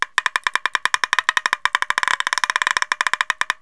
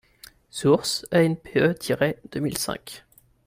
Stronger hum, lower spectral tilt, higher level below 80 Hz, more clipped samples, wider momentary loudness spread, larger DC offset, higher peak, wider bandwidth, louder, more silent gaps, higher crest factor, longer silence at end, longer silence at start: neither; second, 1.5 dB/octave vs -5 dB/octave; about the same, -58 dBFS vs -56 dBFS; neither; second, 2 LU vs 15 LU; first, 0.3% vs under 0.1%; first, 0 dBFS vs -6 dBFS; second, 11 kHz vs 16 kHz; first, -19 LUFS vs -24 LUFS; neither; about the same, 22 dB vs 20 dB; second, 0.1 s vs 0.5 s; second, 0 s vs 0.55 s